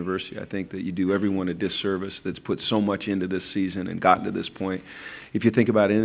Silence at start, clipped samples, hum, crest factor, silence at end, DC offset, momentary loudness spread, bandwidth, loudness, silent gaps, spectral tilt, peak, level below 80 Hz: 0 s; under 0.1%; none; 22 dB; 0 s; under 0.1%; 12 LU; 4 kHz; -25 LUFS; none; -10.5 dB/octave; -2 dBFS; -54 dBFS